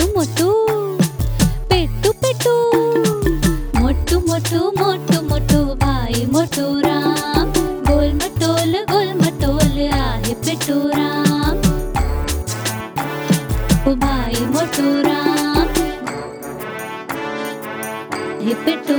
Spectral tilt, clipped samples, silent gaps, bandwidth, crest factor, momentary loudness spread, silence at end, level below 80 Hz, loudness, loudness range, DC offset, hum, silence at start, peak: -5 dB/octave; under 0.1%; none; over 20 kHz; 16 dB; 9 LU; 0 s; -26 dBFS; -18 LUFS; 3 LU; under 0.1%; none; 0 s; 0 dBFS